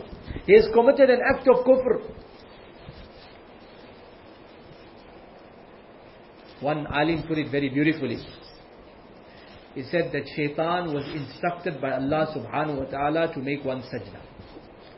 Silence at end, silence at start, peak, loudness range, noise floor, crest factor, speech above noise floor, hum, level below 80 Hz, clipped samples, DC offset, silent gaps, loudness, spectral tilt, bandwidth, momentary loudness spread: 0.1 s; 0 s; -4 dBFS; 24 LU; -48 dBFS; 22 dB; 25 dB; none; -50 dBFS; under 0.1%; under 0.1%; none; -24 LUFS; -10.5 dB/octave; 5.8 kHz; 27 LU